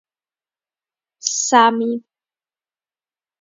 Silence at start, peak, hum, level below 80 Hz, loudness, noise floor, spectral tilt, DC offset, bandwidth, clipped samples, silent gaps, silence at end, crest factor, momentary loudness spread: 1.25 s; 0 dBFS; none; -82 dBFS; -16 LUFS; under -90 dBFS; -1.5 dB/octave; under 0.1%; 7.8 kHz; under 0.1%; none; 1.4 s; 22 dB; 12 LU